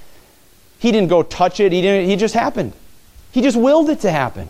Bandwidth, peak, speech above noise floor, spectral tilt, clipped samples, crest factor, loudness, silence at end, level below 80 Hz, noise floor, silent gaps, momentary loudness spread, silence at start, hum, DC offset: 16 kHz; -2 dBFS; 35 dB; -6 dB/octave; under 0.1%; 16 dB; -16 LUFS; 0 s; -46 dBFS; -50 dBFS; none; 8 LU; 0 s; none; under 0.1%